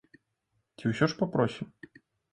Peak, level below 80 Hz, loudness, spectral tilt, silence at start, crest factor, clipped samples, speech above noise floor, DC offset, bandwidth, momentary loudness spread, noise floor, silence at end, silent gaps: -10 dBFS; -64 dBFS; -30 LUFS; -7 dB/octave; 0.8 s; 22 dB; under 0.1%; 49 dB; under 0.1%; 11 kHz; 14 LU; -78 dBFS; 0.7 s; none